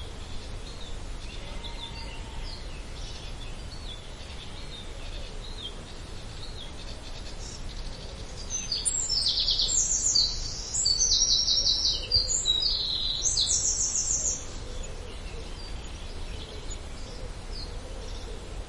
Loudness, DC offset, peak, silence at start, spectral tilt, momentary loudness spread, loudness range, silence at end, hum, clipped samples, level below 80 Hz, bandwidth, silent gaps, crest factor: -24 LUFS; 0.1%; -12 dBFS; 0 s; -0.5 dB/octave; 19 LU; 18 LU; 0 s; none; under 0.1%; -38 dBFS; 11.5 kHz; none; 20 dB